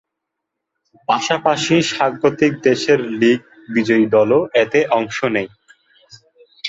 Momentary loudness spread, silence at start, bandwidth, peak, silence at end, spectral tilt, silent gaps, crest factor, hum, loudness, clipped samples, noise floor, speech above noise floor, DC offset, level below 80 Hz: 7 LU; 1.1 s; 8 kHz; -2 dBFS; 0 s; -5 dB/octave; none; 16 dB; none; -16 LUFS; under 0.1%; -79 dBFS; 63 dB; under 0.1%; -60 dBFS